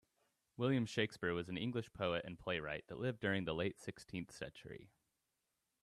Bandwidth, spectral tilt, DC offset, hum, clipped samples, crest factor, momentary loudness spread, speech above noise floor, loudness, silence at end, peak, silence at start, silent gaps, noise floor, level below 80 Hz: 13 kHz; -6 dB/octave; under 0.1%; none; under 0.1%; 20 dB; 13 LU; 46 dB; -41 LUFS; 0.95 s; -24 dBFS; 0.6 s; none; -87 dBFS; -70 dBFS